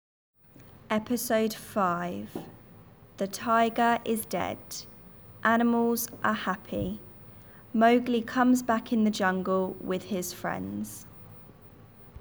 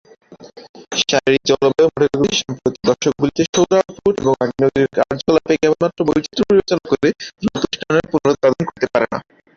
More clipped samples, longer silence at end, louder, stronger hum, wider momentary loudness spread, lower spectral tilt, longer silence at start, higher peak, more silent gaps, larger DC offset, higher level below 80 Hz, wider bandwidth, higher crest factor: neither; second, 0 s vs 0.35 s; second, -28 LUFS vs -17 LUFS; neither; first, 23 LU vs 6 LU; about the same, -5 dB/octave vs -4.5 dB/octave; first, 0.6 s vs 0.3 s; second, -10 dBFS vs -2 dBFS; second, none vs 0.69-0.74 s, 3.49-3.53 s; neither; second, -60 dBFS vs -48 dBFS; first, over 20 kHz vs 7.4 kHz; about the same, 18 dB vs 16 dB